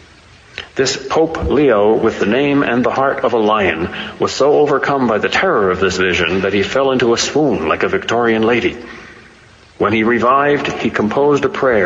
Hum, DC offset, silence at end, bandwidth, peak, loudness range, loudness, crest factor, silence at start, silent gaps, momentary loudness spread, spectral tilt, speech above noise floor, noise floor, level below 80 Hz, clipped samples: none; under 0.1%; 0 s; 8 kHz; -2 dBFS; 2 LU; -14 LUFS; 14 dB; 0.55 s; none; 7 LU; -4.5 dB/octave; 30 dB; -44 dBFS; -40 dBFS; under 0.1%